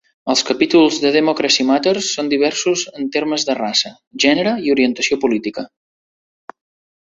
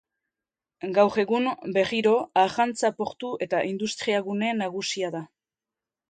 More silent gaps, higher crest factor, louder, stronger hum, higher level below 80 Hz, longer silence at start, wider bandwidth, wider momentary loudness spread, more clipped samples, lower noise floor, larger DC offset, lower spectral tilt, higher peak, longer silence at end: first, 4.07-4.11 s vs none; about the same, 16 dB vs 20 dB; first, -16 LUFS vs -25 LUFS; neither; first, -60 dBFS vs -70 dBFS; second, 0.25 s vs 0.85 s; second, 8 kHz vs 9.4 kHz; second, 7 LU vs 10 LU; neither; about the same, under -90 dBFS vs under -90 dBFS; neither; second, -2.5 dB/octave vs -4.5 dB/octave; first, -2 dBFS vs -6 dBFS; first, 1.35 s vs 0.85 s